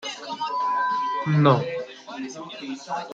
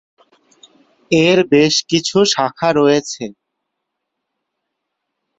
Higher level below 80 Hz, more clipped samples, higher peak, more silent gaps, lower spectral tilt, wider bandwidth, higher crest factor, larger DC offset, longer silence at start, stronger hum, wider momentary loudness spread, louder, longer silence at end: second, -68 dBFS vs -56 dBFS; neither; second, -4 dBFS vs 0 dBFS; neither; first, -6.5 dB/octave vs -4 dB/octave; about the same, 7.8 kHz vs 8 kHz; about the same, 20 dB vs 16 dB; neither; second, 0 s vs 1.1 s; neither; first, 16 LU vs 11 LU; second, -24 LUFS vs -14 LUFS; second, 0 s vs 2.1 s